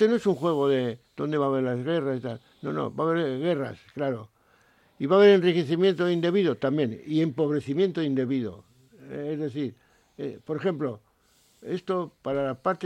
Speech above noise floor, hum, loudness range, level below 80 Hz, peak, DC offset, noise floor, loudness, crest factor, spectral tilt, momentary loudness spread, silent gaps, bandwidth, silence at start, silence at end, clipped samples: 38 dB; none; 9 LU; -68 dBFS; -8 dBFS; under 0.1%; -64 dBFS; -26 LUFS; 18 dB; -7.5 dB/octave; 13 LU; none; 9.2 kHz; 0 s; 0 s; under 0.1%